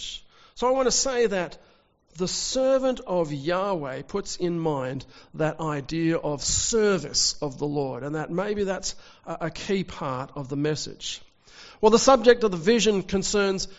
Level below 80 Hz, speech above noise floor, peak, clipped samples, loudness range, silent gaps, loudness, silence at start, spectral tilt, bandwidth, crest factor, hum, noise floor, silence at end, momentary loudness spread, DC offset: -48 dBFS; 25 dB; -4 dBFS; under 0.1%; 7 LU; none; -25 LUFS; 0 s; -4 dB/octave; 8 kHz; 22 dB; none; -49 dBFS; 0.05 s; 13 LU; under 0.1%